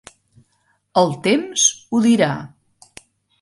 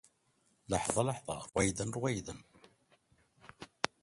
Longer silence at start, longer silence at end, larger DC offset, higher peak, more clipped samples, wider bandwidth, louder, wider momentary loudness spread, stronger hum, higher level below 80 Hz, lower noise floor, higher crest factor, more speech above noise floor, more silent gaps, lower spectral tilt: first, 0.95 s vs 0.7 s; first, 0.95 s vs 0.15 s; neither; first, -2 dBFS vs -6 dBFS; neither; about the same, 11.5 kHz vs 11.5 kHz; first, -17 LUFS vs -35 LUFS; second, 6 LU vs 18 LU; neither; about the same, -62 dBFS vs -58 dBFS; second, -65 dBFS vs -74 dBFS; second, 18 dB vs 32 dB; first, 48 dB vs 39 dB; neither; about the same, -3.5 dB/octave vs -4 dB/octave